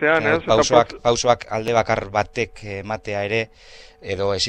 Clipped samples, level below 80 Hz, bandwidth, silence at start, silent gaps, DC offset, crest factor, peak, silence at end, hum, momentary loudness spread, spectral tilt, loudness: under 0.1%; -46 dBFS; 10 kHz; 0 s; none; under 0.1%; 20 dB; -2 dBFS; 0 s; none; 12 LU; -4 dB/octave; -20 LUFS